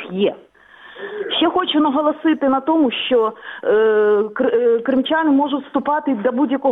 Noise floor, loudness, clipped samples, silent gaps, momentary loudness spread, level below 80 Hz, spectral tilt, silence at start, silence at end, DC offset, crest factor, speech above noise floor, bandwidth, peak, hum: -43 dBFS; -17 LUFS; under 0.1%; none; 6 LU; -60 dBFS; -7.5 dB/octave; 0 s; 0 s; under 0.1%; 12 dB; 27 dB; 4 kHz; -6 dBFS; none